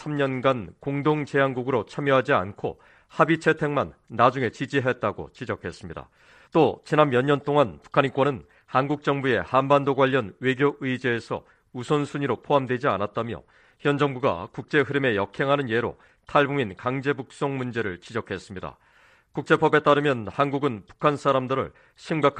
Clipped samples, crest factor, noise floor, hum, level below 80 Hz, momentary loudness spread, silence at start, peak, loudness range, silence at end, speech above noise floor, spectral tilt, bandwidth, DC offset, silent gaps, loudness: under 0.1%; 22 dB; -58 dBFS; none; -60 dBFS; 13 LU; 0 s; -4 dBFS; 3 LU; 0 s; 34 dB; -7 dB/octave; 9.4 kHz; under 0.1%; none; -24 LUFS